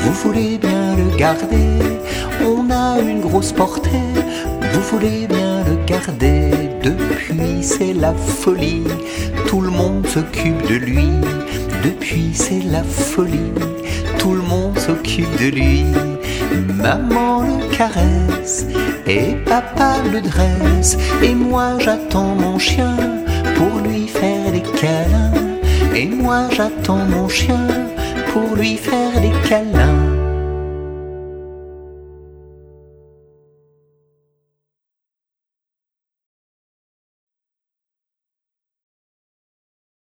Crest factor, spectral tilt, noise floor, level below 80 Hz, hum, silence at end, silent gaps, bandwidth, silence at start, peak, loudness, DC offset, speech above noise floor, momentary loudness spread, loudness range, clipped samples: 16 dB; -5.5 dB/octave; -87 dBFS; -24 dBFS; none; 7.5 s; none; over 20 kHz; 0 s; 0 dBFS; -16 LUFS; under 0.1%; 71 dB; 6 LU; 3 LU; under 0.1%